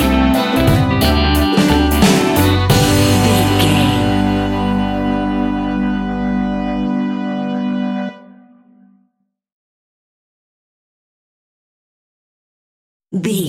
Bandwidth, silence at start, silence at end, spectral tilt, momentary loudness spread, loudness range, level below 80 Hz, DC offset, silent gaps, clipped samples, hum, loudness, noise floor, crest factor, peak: 17 kHz; 0 s; 0 s; -5.5 dB/octave; 8 LU; 14 LU; -28 dBFS; under 0.1%; 9.52-13.00 s; under 0.1%; none; -15 LUFS; -67 dBFS; 16 dB; 0 dBFS